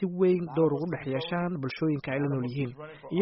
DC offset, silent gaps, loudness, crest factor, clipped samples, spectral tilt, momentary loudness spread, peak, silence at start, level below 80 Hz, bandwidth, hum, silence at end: under 0.1%; none; -29 LUFS; 16 dB; under 0.1%; -6.5 dB/octave; 8 LU; -12 dBFS; 0 s; -64 dBFS; 5.8 kHz; none; 0 s